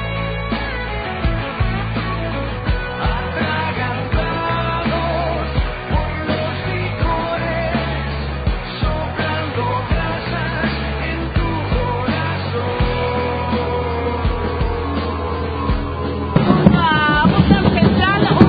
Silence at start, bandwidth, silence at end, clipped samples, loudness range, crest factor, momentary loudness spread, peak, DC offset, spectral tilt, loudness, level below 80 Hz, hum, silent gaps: 0 s; 5 kHz; 0 s; under 0.1%; 5 LU; 18 dB; 9 LU; 0 dBFS; under 0.1%; -10 dB/octave; -19 LUFS; -26 dBFS; none; none